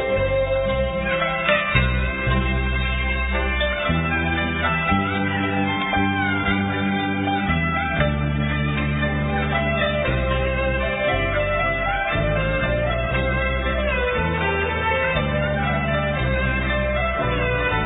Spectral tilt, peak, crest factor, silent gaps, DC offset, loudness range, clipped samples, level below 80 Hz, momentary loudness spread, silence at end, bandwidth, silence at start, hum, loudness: -11 dB/octave; -4 dBFS; 16 dB; none; under 0.1%; 1 LU; under 0.1%; -28 dBFS; 2 LU; 0 s; 4 kHz; 0 s; none; -21 LUFS